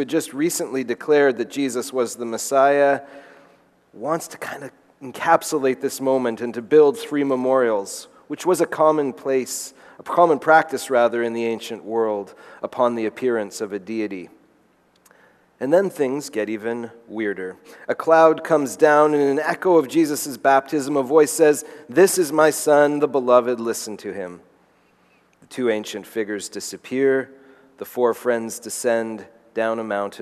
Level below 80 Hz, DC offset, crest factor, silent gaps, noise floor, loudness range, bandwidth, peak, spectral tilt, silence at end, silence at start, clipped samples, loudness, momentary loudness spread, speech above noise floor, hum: -74 dBFS; under 0.1%; 20 dB; none; -59 dBFS; 8 LU; 13.5 kHz; -2 dBFS; -4 dB/octave; 0 s; 0 s; under 0.1%; -20 LUFS; 16 LU; 39 dB; none